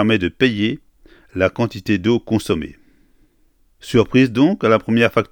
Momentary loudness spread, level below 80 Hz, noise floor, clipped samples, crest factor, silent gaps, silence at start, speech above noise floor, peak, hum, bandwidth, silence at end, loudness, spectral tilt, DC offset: 10 LU; -46 dBFS; -57 dBFS; under 0.1%; 18 dB; none; 0 s; 41 dB; 0 dBFS; none; 18 kHz; 0.1 s; -17 LUFS; -6.5 dB/octave; under 0.1%